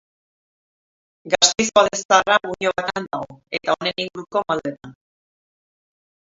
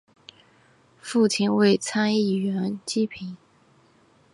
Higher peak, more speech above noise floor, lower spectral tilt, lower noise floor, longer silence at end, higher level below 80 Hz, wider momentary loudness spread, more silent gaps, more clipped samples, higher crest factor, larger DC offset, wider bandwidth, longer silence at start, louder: first, 0 dBFS vs -8 dBFS; first, over 69 dB vs 36 dB; second, -1.5 dB/octave vs -5 dB/octave; first, under -90 dBFS vs -59 dBFS; first, 1.4 s vs 1 s; first, -58 dBFS vs -68 dBFS; about the same, 13 LU vs 13 LU; first, 2.05-2.09 s vs none; neither; about the same, 22 dB vs 18 dB; neither; second, 7.8 kHz vs 11.5 kHz; first, 1.25 s vs 1.05 s; first, -19 LUFS vs -23 LUFS